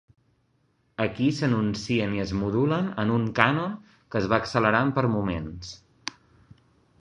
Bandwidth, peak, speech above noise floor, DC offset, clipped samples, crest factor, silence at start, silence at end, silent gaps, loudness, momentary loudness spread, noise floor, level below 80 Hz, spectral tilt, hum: 10 kHz; -2 dBFS; 43 dB; under 0.1%; under 0.1%; 24 dB; 1 s; 0.9 s; none; -25 LUFS; 16 LU; -68 dBFS; -50 dBFS; -6.5 dB/octave; none